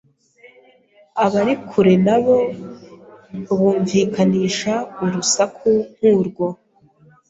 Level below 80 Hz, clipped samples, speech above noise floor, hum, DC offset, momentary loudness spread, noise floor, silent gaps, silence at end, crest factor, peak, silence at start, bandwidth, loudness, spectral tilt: -58 dBFS; under 0.1%; 36 dB; none; under 0.1%; 13 LU; -53 dBFS; none; 0.75 s; 16 dB; -4 dBFS; 1.15 s; 8 kHz; -18 LUFS; -5 dB/octave